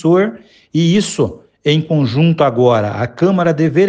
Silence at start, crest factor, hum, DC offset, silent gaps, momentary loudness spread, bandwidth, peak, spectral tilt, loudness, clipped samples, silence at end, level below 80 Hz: 0.05 s; 12 dB; none; under 0.1%; none; 8 LU; 9.4 kHz; 0 dBFS; -6.5 dB/octave; -14 LUFS; under 0.1%; 0 s; -50 dBFS